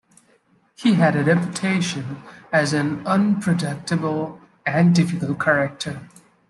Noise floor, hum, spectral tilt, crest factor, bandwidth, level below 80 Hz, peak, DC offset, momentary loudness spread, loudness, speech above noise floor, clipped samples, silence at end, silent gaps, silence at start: -60 dBFS; none; -6 dB/octave; 16 dB; 11.5 kHz; -62 dBFS; -4 dBFS; under 0.1%; 13 LU; -21 LUFS; 40 dB; under 0.1%; 0.4 s; none; 0.8 s